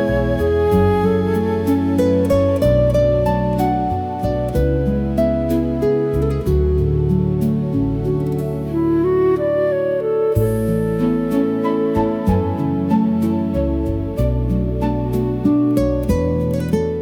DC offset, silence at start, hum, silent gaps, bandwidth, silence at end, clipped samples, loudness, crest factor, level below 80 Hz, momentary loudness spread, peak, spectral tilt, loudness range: under 0.1%; 0 s; none; none; 18 kHz; 0 s; under 0.1%; -18 LUFS; 12 dB; -28 dBFS; 5 LU; -4 dBFS; -9 dB/octave; 2 LU